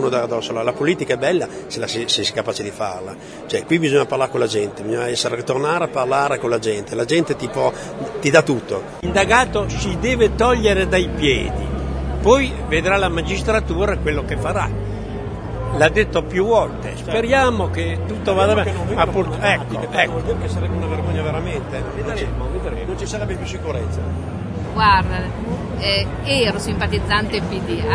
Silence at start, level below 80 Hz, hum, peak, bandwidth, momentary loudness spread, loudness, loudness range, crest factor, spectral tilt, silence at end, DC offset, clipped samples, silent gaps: 0 s; -32 dBFS; none; 0 dBFS; 11 kHz; 10 LU; -19 LUFS; 4 LU; 20 dB; -5 dB/octave; 0 s; under 0.1%; under 0.1%; none